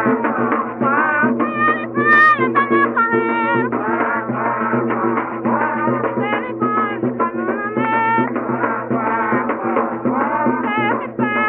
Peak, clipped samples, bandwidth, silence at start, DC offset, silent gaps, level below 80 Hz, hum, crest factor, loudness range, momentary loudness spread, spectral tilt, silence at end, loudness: -2 dBFS; under 0.1%; 5.8 kHz; 0 s; under 0.1%; none; -60 dBFS; none; 16 dB; 4 LU; 5 LU; -8.5 dB/octave; 0 s; -17 LUFS